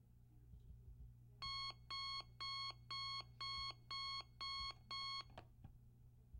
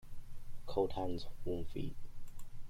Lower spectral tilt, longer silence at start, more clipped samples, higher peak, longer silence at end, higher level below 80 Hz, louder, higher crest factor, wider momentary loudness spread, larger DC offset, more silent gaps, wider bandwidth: second, -2 dB/octave vs -7 dB/octave; about the same, 0 s vs 0.05 s; neither; second, -36 dBFS vs -20 dBFS; about the same, 0 s vs 0 s; second, -66 dBFS vs -48 dBFS; second, -47 LUFS vs -41 LUFS; about the same, 14 dB vs 16 dB; about the same, 19 LU vs 20 LU; neither; neither; first, 16 kHz vs 11 kHz